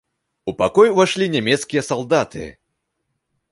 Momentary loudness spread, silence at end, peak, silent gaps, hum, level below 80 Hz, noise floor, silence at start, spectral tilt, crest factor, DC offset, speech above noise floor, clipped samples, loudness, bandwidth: 17 LU; 1 s; -2 dBFS; none; none; -52 dBFS; -74 dBFS; 0.45 s; -4.5 dB/octave; 18 dB; under 0.1%; 57 dB; under 0.1%; -18 LUFS; 11.5 kHz